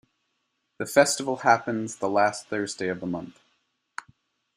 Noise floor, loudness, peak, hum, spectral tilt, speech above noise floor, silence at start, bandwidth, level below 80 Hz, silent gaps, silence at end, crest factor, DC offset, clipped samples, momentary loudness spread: -76 dBFS; -25 LUFS; -4 dBFS; none; -3.5 dB/octave; 52 dB; 0.8 s; 15.5 kHz; -70 dBFS; none; 1.25 s; 24 dB; under 0.1%; under 0.1%; 20 LU